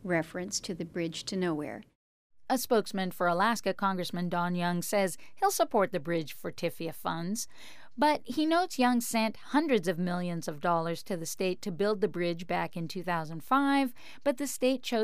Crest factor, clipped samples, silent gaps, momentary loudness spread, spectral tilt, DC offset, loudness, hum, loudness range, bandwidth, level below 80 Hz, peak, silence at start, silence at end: 16 dB; under 0.1%; 1.95-2.30 s; 8 LU; -4.5 dB/octave; 0.7%; -31 LUFS; none; 3 LU; 15.5 kHz; -68 dBFS; -14 dBFS; 0 s; 0 s